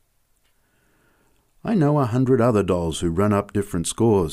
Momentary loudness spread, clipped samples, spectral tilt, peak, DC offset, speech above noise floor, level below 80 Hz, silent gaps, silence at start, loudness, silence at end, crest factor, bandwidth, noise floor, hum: 7 LU; under 0.1%; -6.5 dB/octave; -8 dBFS; under 0.1%; 44 dB; -46 dBFS; none; 1.65 s; -21 LUFS; 0 s; 14 dB; 15.5 kHz; -64 dBFS; none